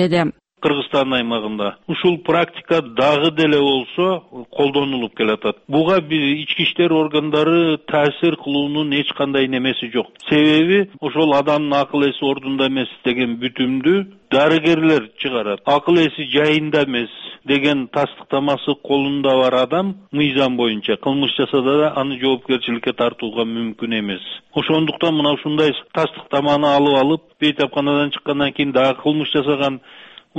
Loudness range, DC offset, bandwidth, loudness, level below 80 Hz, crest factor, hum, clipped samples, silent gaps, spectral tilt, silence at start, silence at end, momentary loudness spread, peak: 2 LU; under 0.1%; 8.4 kHz; -18 LUFS; -56 dBFS; 14 dB; none; under 0.1%; none; -6.5 dB/octave; 0 s; 0 s; 7 LU; -4 dBFS